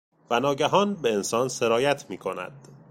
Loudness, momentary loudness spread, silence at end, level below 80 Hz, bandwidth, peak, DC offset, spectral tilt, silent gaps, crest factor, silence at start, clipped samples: -25 LUFS; 11 LU; 0.15 s; -66 dBFS; 16.5 kHz; -6 dBFS; under 0.1%; -4 dB/octave; none; 18 dB; 0.3 s; under 0.1%